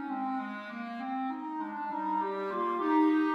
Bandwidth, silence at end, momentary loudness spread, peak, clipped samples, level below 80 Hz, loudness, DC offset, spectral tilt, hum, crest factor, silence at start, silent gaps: 5.8 kHz; 0 s; 12 LU; -16 dBFS; under 0.1%; -82 dBFS; -32 LUFS; under 0.1%; -7 dB/octave; none; 16 dB; 0 s; none